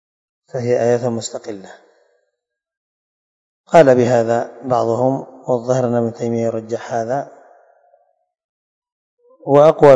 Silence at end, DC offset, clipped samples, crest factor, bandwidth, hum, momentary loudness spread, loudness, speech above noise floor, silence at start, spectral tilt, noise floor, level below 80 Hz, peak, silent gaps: 0 s; under 0.1%; 0.3%; 18 dB; 9 kHz; none; 16 LU; -16 LUFS; 62 dB; 0.55 s; -6.5 dB/octave; -77 dBFS; -58 dBFS; 0 dBFS; 2.77-3.64 s, 8.44-8.82 s, 8.92-9.18 s